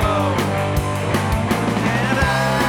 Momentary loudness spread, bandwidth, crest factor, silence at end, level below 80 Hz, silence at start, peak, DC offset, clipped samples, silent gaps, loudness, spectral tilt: 3 LU; 18 kHz; 14 dB; 0 s; -30 dBFS; 0 s; -4 dBFS; under 0.1%; under 0.1%; none; -19 LUFS; -5.5 dB/octave